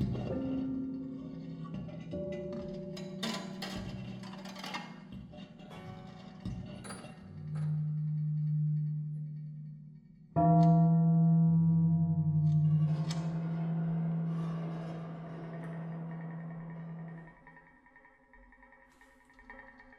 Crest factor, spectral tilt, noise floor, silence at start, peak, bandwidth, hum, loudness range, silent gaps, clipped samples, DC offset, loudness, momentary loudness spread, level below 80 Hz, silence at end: 18 dB; -8.5 dB/octave; -62 dBFS; 0 s; -16 dBFS; 10.5 kHz; none; 17 LU; none; under 0.1%; under 0.1%; -33 LUFS; 22 LU; -60 dBFS; 0.05 s